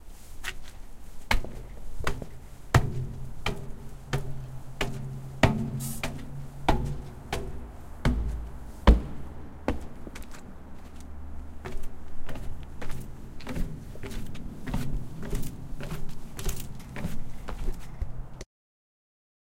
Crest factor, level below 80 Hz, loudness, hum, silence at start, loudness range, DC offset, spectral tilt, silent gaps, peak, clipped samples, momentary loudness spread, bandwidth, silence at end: 26 dB; -34 dBFS; -33 LUFS; none; 0 s; 10 LU; under 0.1%; -5.5 dB/octave; none; -4 dBFS; under 0.1%; 19 LU; 16.5 kHz; 1 s